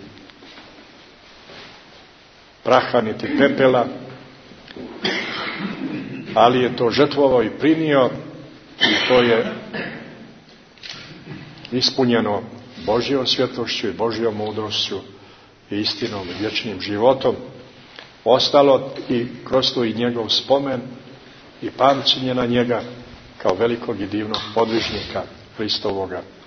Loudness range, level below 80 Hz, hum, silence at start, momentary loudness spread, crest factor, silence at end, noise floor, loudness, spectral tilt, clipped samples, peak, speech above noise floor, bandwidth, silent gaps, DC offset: 5 LU; -54 dBFS; none; 0 s; 21 LU; 20 dB; 0 s; -48 dBFS; -19 LUFS; -5 dB/octave; under 0.1%; 0 dBFS; 29 dB; 6.6 kHz; none; under 0.1%